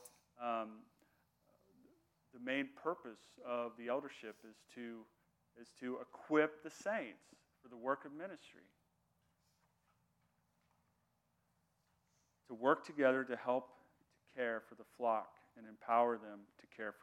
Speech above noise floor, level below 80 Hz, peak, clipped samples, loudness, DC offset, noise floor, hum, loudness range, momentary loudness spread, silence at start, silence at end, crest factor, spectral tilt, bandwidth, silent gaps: 40 dB; under -90 dBFS; -20 dBFS; under 0.1%; -41 LUFS; under 0.1%; -81 dBFS; none; 9 LU; 23 LU; 0 s; 0.1 s; 24 dB; -5 dB/octave; 16.5 kHz; none